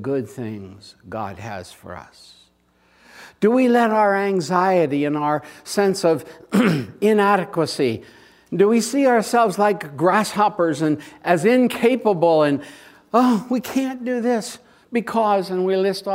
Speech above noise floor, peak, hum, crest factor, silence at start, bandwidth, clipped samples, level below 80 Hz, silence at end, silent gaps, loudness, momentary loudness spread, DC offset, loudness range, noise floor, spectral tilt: 40 dB; -2 dBFS; none; 18 dB; 0 s; 16 kHz; under 0.1%; -64 dBFS; 0 s; none; -19 LUFS; 15 LU; under 0.1%; 3 LU; -60 dBFS; -5.5 dB/octave